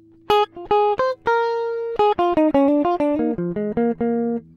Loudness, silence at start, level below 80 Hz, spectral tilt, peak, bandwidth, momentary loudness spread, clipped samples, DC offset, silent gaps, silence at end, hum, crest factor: -20 LUFS; 0.3 s; -50 dBFS; -7 dB/octave; -4 dBFS; 12 kHz; 6 LU; under 0.1%; under 0.1%; none; 0.15 s; none; 16 dB